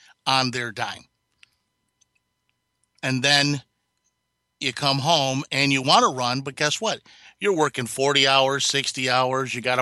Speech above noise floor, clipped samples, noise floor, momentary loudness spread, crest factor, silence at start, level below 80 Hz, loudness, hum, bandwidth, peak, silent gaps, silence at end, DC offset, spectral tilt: 54 dB; under 0.1%; -76 dBFS; 11 LU; 20 dB; 0.25 s; -68 dBFS; -21 LUFS; none; 12.5 kHz; -4 dBFS; none; 0 s; under 0.1%; -3 dB/octave